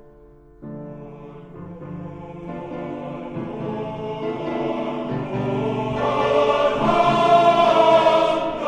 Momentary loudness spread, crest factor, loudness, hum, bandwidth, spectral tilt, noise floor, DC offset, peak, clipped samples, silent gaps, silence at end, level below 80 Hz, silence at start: 22 LU; 18 dB; -20 LUFS; none; 9.4 kHz; -6.5 dB/octave; -47 dBFS; under 0.1%; -4 dBFS; under 0.1%; none; 0 s; -48 dBFS; 0.6 s